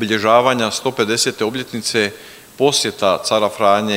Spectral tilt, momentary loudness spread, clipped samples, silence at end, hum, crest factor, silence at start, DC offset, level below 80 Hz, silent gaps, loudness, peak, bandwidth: -3 dB/octave; 8 LU; under 0.1%; 0 s; none; 16 dB; 0 s; under 0.1%; -60 dBFS; none; -16 LUFS; 0 dBFS; 16.5 kHz